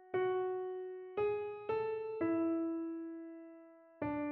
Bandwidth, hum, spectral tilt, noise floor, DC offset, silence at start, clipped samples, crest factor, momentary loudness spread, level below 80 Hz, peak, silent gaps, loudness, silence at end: 4.3 kHz; none; -6 dB/octave; -58 dBFS; under 0.1%; 0 s; under 0.1%; 14 dB; 14 LU; -74 dBFS; -26 dBFS; none; -38 LUFS; 0 s